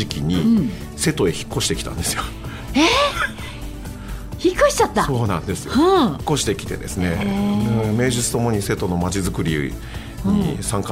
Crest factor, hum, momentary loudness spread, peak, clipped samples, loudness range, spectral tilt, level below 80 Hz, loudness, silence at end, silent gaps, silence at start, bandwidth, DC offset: 18 dB; none; 15 LU; -2 dBFS; under 0.1%; 2 LU; -4.5 dB/octave; -34 dBFS; -20 LUFS; 0 s; none; 0 s; 16 kHz; under 0.1%